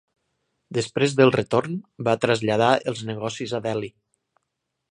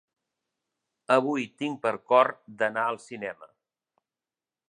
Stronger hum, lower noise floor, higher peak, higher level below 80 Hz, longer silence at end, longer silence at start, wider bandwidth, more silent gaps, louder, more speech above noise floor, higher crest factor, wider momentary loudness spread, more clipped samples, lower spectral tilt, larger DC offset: neither; second, -79 dBFS vs under -90 dBFS; first, -2 dBFS vs -6 dBFS; first, -62 dBFS vs -82 dBFS; second, 1.05 s vs 1.25 s; second, 0.7 s vs 1.1 s; about the same, 10.5 kHz vs 10.5 kHz; neither; first, -23 LUFS vs -27 LUFS; second, 57 dB vs over 64 dB; about the same, 22 dB vs 24 dB; second, 12 LU vs 15 LU; neither; about the same, -5.5 dB/octave vs -5 dB/octave; neither